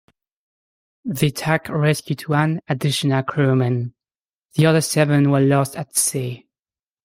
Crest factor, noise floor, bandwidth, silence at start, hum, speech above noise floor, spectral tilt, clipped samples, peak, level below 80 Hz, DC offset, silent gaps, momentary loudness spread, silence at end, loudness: 18 dB; under -90 dBFS; 16.5 kHz; 1.05 s; none; over 72 dB; -5 dB/octave; under 0.1%; -4 dBFS; -58 dBFS; under 0.1%; 4.33-4.40 s; 11 LU; 0.7 s; -19 LUFS